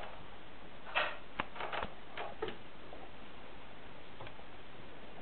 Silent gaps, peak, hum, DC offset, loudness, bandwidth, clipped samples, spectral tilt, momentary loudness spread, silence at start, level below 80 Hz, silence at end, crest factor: none; -18 dBFS; none; 0.9%; -44 LUFS; 4.5 kHz; under 0.1%; -1.5 dB/octave; 16 LU; 0 s; -62 dBFS; 0 s; 28 dB